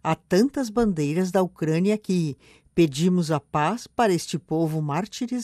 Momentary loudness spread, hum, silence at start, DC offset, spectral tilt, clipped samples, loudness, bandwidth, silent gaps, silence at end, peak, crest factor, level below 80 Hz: 6 LU; none; 0.05 s; under 0.1%; -6.5 dB/octave; under 0.1%; -24 LUFS; 14.5 kHz; none; 0 s; -8 dBFS; 16 dB; -54 dBFS